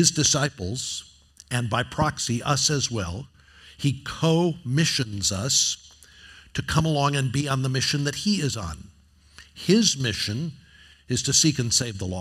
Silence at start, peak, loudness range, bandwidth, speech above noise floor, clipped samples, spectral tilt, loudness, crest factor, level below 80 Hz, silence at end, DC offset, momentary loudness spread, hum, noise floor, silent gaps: 0 s; -2 dBFS; 2 LU; 15.5 kHz; 31 dB; under 0.1%; -3.5 dB/octave; -23 LUFS; 22 dB; -50 dBFS; 0 s; under 0.1%; 12 LU; none; -55 dBFS; none